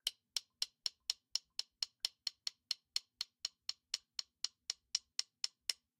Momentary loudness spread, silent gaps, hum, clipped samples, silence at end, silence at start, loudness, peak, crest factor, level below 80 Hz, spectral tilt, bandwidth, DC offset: 5 LU; none; none; under 0.1%; 0.25 s; 0.05 s; -42 LUFS; -16 dBFS; 30 dB; -86 dBFS; 3.5 dB/octave; 16.5 kHz; under 0.1%